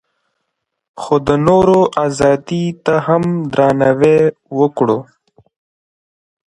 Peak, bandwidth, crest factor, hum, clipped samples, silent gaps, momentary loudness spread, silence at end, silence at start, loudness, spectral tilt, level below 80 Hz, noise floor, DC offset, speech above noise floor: 0 dBFS; 11 kHz; 14 dB; none; under 0.1%; none; 7 LU; 1.55 s; 0.95 s; -14 LUFS; -7 dB/octave; -46 dBFS; -74 dBFS; under 0.1%; 61 dB